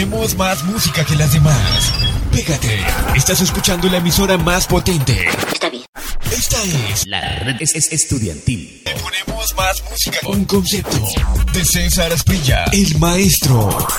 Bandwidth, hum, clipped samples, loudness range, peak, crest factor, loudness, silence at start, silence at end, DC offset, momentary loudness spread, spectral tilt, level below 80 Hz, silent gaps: 17.5 kHz; none; under 0.1%; 3 LU; 0 dBFS; 16 dB; -15 LUFS; 0 s; 0 s; under 0.1%; 7 LU; -4 dB/octave; -24 dBFS; 5.88-5.93 s